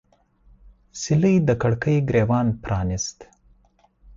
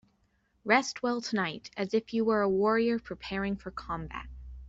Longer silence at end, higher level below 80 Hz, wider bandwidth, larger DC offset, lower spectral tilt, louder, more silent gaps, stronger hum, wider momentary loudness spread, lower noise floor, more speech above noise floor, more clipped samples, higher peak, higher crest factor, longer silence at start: about the same, 0.05 s vs 0 s; first, -42 dBFS vs -52 dBFS; about the same, 7.8 kHz vs 8 kHz; neither; first, -6.5 dB/octave vs -5 dB/octave; first, -21 LUFS vs -30 LUFS; neither; neither; about the same, 11 LU vs 12 LU; second, -60 dBFS vs -71 dBFS; about the same, 39 dB vs 42 dB; neither; about the same, -8 dBFS vs -10 dBFS; about the same, 16 dB vs 20 dB; first, 0.95 s vs 0.65 s